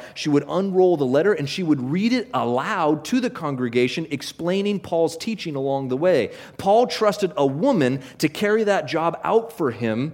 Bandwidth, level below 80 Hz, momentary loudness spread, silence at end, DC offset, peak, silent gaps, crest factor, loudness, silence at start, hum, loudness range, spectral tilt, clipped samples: 16.5 kHz; -62 dBFS; 7 LU; 0 s; under 0.1%; -4 dBFS; none; 16 dB; -22 LUFS; 0 s; none; 3 LU; -6 dB/octave; under 0.1%